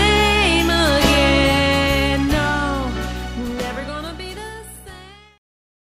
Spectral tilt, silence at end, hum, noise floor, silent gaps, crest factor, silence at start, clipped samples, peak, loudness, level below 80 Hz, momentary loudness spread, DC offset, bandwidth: -4.5 dB/octave; 0.65 s; none; -41 dBFS; none; 18 dB; 0 s; under 0.1%; -2 dBFS; -17 LUFS; -28 dBFS; 17 LU; under 0.1%; 15.5 kHz